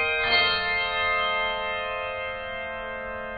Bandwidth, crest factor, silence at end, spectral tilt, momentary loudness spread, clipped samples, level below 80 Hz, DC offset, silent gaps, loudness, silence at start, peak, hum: 5 kHz; 18 dB; 0 s; 1.5 dB/octave; 12 LU; under 0.1%; -50 dBFS; under 0.1%; none; -25 LUFS; 0 s; -10 dBFS; none